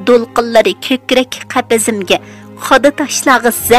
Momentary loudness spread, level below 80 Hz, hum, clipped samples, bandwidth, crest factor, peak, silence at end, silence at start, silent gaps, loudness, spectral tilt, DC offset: 6 LU; -44 dBFS; none; 0.3%; 16 kHz; 12 dB; 0 dBFS; 0 s; 0 s; none; -12 LUFS; -2.5 dB/octave; 0.3%